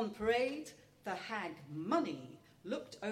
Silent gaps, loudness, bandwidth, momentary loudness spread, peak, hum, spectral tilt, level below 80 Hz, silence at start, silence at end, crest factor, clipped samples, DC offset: none; -39 LUFS; 15.5 kHz; 16 LU; -20 dBFS; none; -5 dB/octave; -70 dBFS; 0 s; 0 s; 20 dB; under 0.1%; under 0.1%